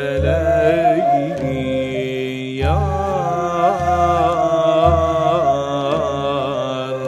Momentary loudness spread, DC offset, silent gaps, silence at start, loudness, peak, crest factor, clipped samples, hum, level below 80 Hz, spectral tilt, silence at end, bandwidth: 7 LU; under 0.1%; none; 0 s; -17 LUFS; -2 dBFS; 14 dB; under 0.1%; none; -32 dBFS; -7 dB/octave; 0 s; 12 kHz